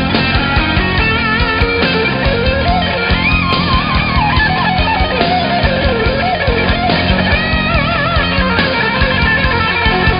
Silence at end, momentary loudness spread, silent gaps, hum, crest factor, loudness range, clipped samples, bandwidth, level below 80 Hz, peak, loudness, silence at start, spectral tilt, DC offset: 0 s; 2 LU; none; none; 12 dB; 1 LU; under 0.1%; 5.4 kHz; -22 dBFS; 0 dBFS; -12 LUFS; 0 s; -9 dB/octave; under 0.1%